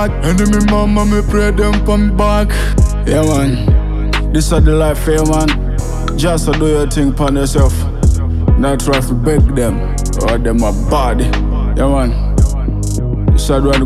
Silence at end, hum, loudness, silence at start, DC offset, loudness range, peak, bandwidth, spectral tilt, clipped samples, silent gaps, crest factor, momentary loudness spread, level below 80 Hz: 0 s; none; -13 LUFS; 0 s; under 0.1%; 2 LU; -2 dBFS; 14 kHz; -6 dB/octave; under 0.1%; none; 10 dB; 5 LU; -14 dBFS